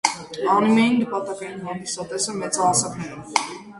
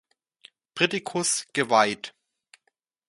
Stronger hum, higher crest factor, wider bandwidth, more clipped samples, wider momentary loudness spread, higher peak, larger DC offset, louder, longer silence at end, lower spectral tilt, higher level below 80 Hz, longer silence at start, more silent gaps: neither; about the same, 22 dB vs 24 dB; about the same, 11.5 kHz vs 11.5 kHz; neither; second, 13 LU vs 16 LU; first, 0 dBFS vs -4 dBFS; neither; about the same, -22 LUFS vs -24 LUFS; second, 0 s vs 1 s; about the same, -3.5 dB/octave vs -2.5 dB/octave; first, -60 dBFS vs -72 dBFS; second, 0.05 s vs 0.75 s; neither